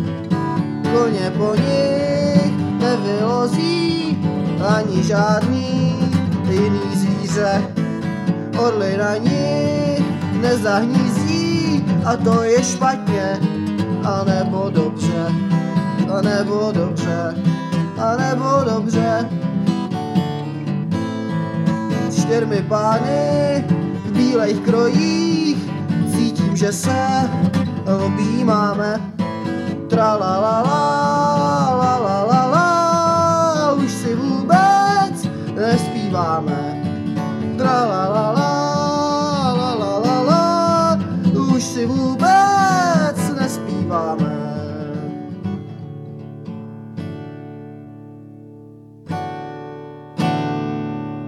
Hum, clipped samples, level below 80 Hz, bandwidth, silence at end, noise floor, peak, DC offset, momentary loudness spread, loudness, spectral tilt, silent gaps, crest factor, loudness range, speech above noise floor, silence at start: none; under 0.1%; -56 dBFS; 13 kHz; 0 s; -40 dBFS; 0 dBFS; under 0.1%; 10 LU; -18 LUFS; -6.5 dB/octave; none; 16 dB; 8 LU; 24 dB; 0 s